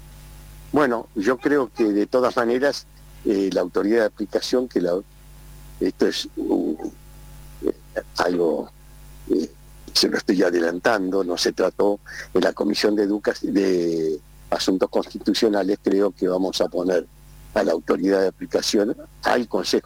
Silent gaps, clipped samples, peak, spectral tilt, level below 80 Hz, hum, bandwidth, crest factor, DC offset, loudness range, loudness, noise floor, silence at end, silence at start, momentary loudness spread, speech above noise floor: none; under 0.1%; -8 dBFS; -4.5 dB/octave; -48 dBFS; none; 17 kHz; 14 dB; under 0.1%; 4 LU; -22 LUFS; -43 dBFS; 0.05 s; 0 s; 7 LU; 22 dB